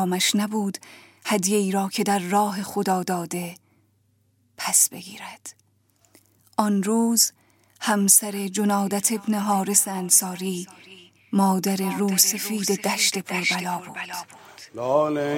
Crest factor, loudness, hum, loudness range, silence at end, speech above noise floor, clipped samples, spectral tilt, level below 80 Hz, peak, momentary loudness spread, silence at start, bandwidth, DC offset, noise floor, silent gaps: 20 dB; -22 LUFS; none; 5 LU; 0 s; 42 dB; under 0.1%; -3 dB/octave; -74 dBFS; -4 dBFS; 16 LU; 0 s; 17 kHz; under 0.1%; -65 dBFS; none